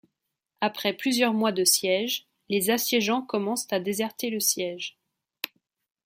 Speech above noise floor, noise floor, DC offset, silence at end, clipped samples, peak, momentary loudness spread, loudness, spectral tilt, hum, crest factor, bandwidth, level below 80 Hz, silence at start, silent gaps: 56 dB; -82 dBFS; under 0.1%; 0.6 s; under 0.1%; -8 dBFS; 14 LU; -25 LUFS; -2.5 dB/octave; none; 20 dB; 16.5 kHz; -76 dBFS; 0.6 s; none